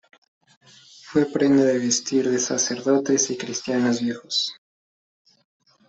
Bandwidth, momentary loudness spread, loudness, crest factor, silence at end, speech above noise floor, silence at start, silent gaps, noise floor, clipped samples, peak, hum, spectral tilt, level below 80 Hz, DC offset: 8.2 kHz; 7 LU; -22 LUFS; 18 dB; 1.35 s; 26 dB; 1.05 s; none; -47 dBFS; under 0.1%; -6 dBFS; none; -3.5 dB/octave; -66 dBFS; under 0.1%